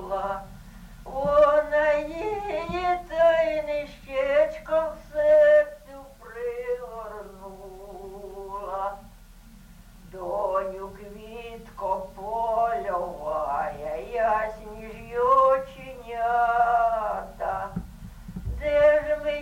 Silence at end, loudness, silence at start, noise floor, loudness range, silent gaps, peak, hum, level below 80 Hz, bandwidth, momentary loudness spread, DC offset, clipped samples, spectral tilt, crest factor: 0 s; -25 LUFS; 0 s; -48 dBFS; 12 LU; none; -8 dBFS; none; -46 dBFS; 16 kHz; 21 LU; under 0.1%; under 0.1%; -5.5 dB/octave; 16 dB